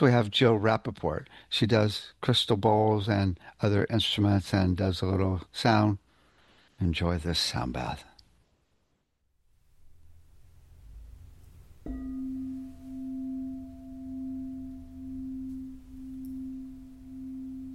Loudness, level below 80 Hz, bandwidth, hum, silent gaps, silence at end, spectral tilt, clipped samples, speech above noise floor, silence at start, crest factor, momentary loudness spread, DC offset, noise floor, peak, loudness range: -28 LUFS; -50 dBFS; 12.5 kHz; none; none; 0 s; -6 dB/octave; under 0.1%; 48 dB; 0 s; 20 dB; 19 LU; under 0.1%; -74 dBFS; -10 dBFS; 16 LU